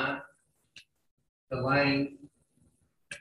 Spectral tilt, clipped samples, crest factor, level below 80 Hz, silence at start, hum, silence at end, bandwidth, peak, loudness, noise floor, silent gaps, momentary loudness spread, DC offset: -6 dB/octave; under 0.1%; 20 dB; -64 dBFS; 0 s; none; 0 s; 11 kHz; -14 dBFS; -30 LUFS; -70 dBFS; 1.11-1.17 s, 1.29-1.47 s; 14 LU; under 0.1%